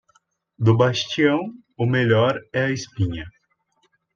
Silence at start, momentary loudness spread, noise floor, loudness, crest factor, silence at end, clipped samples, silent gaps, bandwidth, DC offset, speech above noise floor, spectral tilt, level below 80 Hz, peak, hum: 0.6 s; 10 LU; -67 dBFS; -21 LUFS; 18 dB; 0.85 s; under 0.1%; none; 7.2 kHz; under 0.1%; 47 dB; -6.5 dB/octave; -54 dBFS; -4 dBFS; none